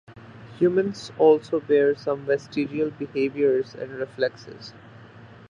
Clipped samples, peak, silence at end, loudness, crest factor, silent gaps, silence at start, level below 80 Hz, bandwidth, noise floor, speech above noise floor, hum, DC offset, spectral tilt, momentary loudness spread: under 0.1%; -6 dBFS; 0.25 s; -24 LUFS; 18 dB; none; 0.1 s; -64 dBFS; 7.6 kHz; -46 dBFS; 23 dB; none; under 0.1%; -6.5 dB/octave; 18 LU